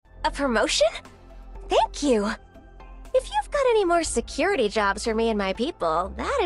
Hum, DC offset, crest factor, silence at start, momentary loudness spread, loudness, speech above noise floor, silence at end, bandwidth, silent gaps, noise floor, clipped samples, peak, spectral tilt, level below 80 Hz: none; under 0.1%; 16 dB; 0.15 s; 6 LU; -24 LUFS; 21 dB; 0 s; 12 kHz; none; -44 dBFS; under 0.1%; -8 dBFS; -3.5 dB/octave; -42 dBFS